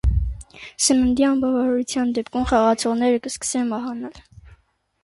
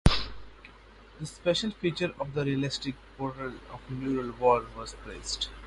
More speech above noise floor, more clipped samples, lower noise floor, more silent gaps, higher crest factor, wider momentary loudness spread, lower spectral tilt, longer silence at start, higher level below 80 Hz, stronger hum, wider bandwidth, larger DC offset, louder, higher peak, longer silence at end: first, 37 dB vs 21 dB; neither; first, -58 dBFS vs -52 dBFS; neither; second, 16 dB vs 26 dB; about the same, 14 LU vs 16 LU; about the same, -4.5 dB/octave vs -5 dB/octave; about the same, 0.05 s vs 0.05 s; first, -32 dBFS vs -40 dBFS; neither; about the same, 11.5 kHz vs 11.5 kHz; neither; first, -21 LUFS vs -31 LUFS; about the same, -6 dBFS vs -6 dBFS; first, 0.5 s vs 0 s